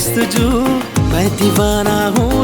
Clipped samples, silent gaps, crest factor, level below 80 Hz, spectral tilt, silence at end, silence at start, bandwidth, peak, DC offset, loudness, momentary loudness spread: under 0.1%; none; 14 dB; -26 dBFS; -5 dB/octave; 0 s; 0 s; over 20 kHz; 0 dBFS; under 0.1%; -14 LUFS; 2 LU